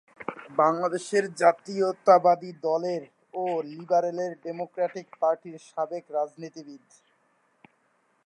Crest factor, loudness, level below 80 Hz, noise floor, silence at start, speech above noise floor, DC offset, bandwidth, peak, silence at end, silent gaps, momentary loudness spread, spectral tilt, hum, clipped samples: 22 dB; -26 LUFS; -84 dBFS; -69 dBFS; 0.2 s; 43 dB; under 0.1%; 11 kHz; -6 dBFS; 1.5 s; none; 16 LU; -5.5 dB/octave; none; under 0.1%